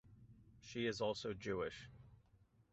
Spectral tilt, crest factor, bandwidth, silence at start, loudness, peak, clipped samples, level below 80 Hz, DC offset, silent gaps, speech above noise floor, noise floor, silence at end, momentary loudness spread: -4 dB/octave; 18 dB; 8 kHz; 0.05 s; -43 LUFS; -28 dBFS; under 0.1%; -68 dBFS; under 0.1%; none; 29 dB; -72 dBFS; 0.55 s; 24 LU